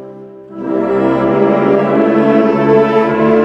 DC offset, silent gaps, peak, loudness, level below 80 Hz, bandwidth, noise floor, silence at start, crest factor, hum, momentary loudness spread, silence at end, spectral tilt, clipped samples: under 0.1%; none; 0 dBFS; -11 LUFS; -46 dBFS; 6.6 kHz; -32 dBFS; 0 s; 12 dB; none; 10 LU; 0 s; -8.5 dB/octave; under 0.1%